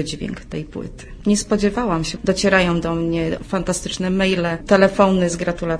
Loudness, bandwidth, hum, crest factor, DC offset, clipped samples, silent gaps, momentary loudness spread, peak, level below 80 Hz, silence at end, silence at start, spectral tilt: -19 LUFS; 11 kHz; none; 18 dB; under 0.1%; under 0.1%; none; 13 LU; 0 dBFS; -36 dBFS; 0 s; 0 s; -5 dB/octave